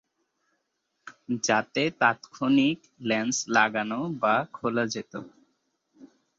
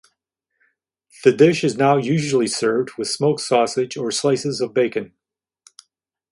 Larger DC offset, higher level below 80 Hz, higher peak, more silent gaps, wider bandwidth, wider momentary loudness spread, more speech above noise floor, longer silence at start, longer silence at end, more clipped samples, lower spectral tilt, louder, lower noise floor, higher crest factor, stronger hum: neither; second, -70 dBFS vs -64 dBFS; second, -8 dBFS vs 0 dBFS; neither; second, 8 kHz vs 11.5 kHz; first, 11 LU vs 7 LU; second, 51 dB vs 67 dB; second, 1.05 s vs 1.2 s; second, 0.3 s vs 1.25 s; neither; second, -3.5 dB/octave vs -5 dB/octave; second, -26 LUFS vs -19 LUFS; second, -78 dBFS vs -86 dBFS; about the same, 22 dB vs 20 dB; neither